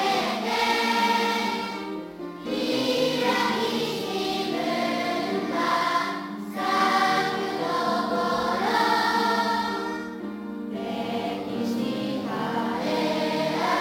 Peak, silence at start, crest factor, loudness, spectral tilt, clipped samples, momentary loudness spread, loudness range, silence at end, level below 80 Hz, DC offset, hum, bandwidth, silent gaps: -10 dBFS; 0 s; 16 dB; -25 LUFS; -4 dB/octave; under 0.1%; 10 LU; 4 LU; 0 s; -62 dBFS; under 0.1%; none; 17 kHz; none